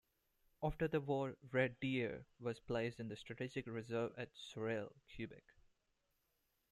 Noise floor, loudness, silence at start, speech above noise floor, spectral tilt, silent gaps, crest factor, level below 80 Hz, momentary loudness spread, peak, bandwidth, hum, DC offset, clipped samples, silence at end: -84 dBFS; -43 LUFS; 0.6 s; 41 dB; -7 dB/octave; none; 22 dB; -66 dBFS; 11 LU; -22 dBFS; 13.5 kHz; none; under 0.1%; under 0.1%; 1.35 s